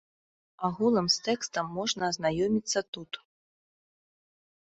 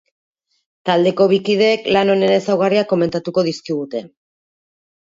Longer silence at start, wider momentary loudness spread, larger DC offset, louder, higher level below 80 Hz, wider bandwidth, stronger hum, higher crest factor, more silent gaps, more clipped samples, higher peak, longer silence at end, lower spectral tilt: second, 0.6 s vs 0.85 s; first, 13 LU vs 10 LU; neither; second, -29 LUFS vs -16 LUFS; about the same, -64 dBFS vs -60 dBFS; about the same, 8.2 kHz vs 7.8 kHz; neither; about the same, 20 dB vs 16 dB; first, 2.88-2.93 s vs none; neither; second, -12 dBFS vs -2 dBFS; first, 1.5 s vs 0.95 s; second, -3.5 dB/octave vs -6 dB/octave